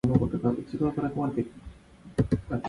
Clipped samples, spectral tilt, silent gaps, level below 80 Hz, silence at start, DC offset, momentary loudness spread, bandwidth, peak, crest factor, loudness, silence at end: under 0.1%; -9.5 dB/octave; none; -46 dBFS; 0.05 s; under 0.1%; 9 LU; 11.5 kHz; -8 dBFS; 20 dB; -29 LUFS; 0 s